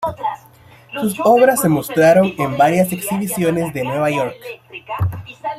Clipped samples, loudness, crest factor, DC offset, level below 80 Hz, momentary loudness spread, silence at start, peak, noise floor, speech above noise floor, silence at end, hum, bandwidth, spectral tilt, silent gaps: under 0.1%; -16 LUFS; 16 dB; under 0.1%; -50 dBFS; 17 LU; 0 s; -2 dBFS; -45 dBFS; 29 dB; 0 s; none; 16 kHz; -5.5 dB/octave; none